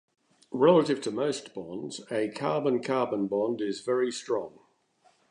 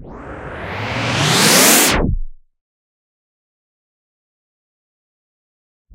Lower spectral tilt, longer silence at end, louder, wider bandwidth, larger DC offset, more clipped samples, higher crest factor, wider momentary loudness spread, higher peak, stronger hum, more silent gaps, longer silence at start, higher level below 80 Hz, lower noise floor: first, -5.5 dB/octave vs -2.5 dB/octave; second, 0.8 s vs 3.6 s; second, -28 LUFS vs -12 LUFS; second, 10.5 kHz vs 16 kHz; neither; neither; about the same, 20 dB vs 20 dB; second, 16 LU vs 22 LU; second, -8 dBFS vs 0 dBFS; neither; neither; first, 0.5 s vs 0 s; second, -76 dBFS vs -32 dBFS; second, -66 dBFS vs under -90 dBFS